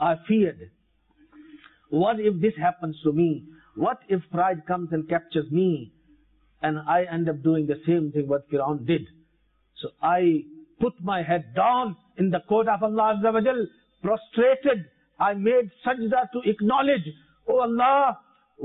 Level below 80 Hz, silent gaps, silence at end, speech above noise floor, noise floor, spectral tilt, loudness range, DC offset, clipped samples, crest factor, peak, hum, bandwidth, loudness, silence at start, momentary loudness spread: -62 dBFS; none; 0 s; 43 dB; -67 dBFS; -11.5 dB/octave; 3 LU; under 0.1%; under 0.1%; 14 dB; -10 dBFS; none; 4 kHz; -24 LUFS; 0 s; 8 LU